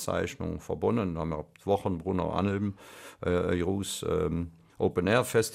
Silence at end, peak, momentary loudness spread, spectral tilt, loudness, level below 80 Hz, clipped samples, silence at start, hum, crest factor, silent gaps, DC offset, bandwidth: 0 s; -12 dBFS; 10 LU; -5.5 dB/octave; -30 LUFS; -50 dBFS; under 0.1%; 0 s; none; 18 dB; none; under 0.1%; 15.5 kHz